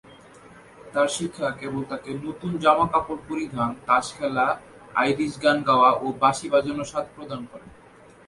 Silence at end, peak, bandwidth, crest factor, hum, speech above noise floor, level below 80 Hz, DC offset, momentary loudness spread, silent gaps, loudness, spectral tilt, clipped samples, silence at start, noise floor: 0.55 s; -4 dBFS; 11.5 kHz; 20 dB; none; 27 dB; -56 dBFS; under 0.1%; 13 LU; none; -23 LUFS; -4.5 dB/octave; under 0.1%; 0.1 s; -50 dBFS